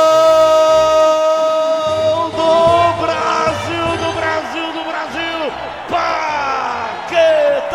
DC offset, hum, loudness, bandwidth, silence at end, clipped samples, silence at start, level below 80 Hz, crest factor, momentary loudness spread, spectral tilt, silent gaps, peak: 0.1%; none; -14 LUFS; 13.5 kHz; 0 s; under 0.1%; 0 s; -46 dBFS; 14 dB; 11 LU; -4 dB/octave; none; 0 dBFS